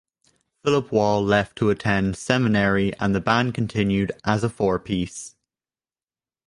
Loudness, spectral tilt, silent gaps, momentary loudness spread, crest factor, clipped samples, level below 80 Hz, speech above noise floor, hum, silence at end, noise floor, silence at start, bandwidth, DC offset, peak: -22 LUFS; -6 dB/octave; none; 7 LU; 20 dB; under 0.1%; -46 dBFS; over 69 dB; none; 1.2 s; under -90 dBFS; 0.65 s; 11.5 kHz; under 0.1%; -2 dBFS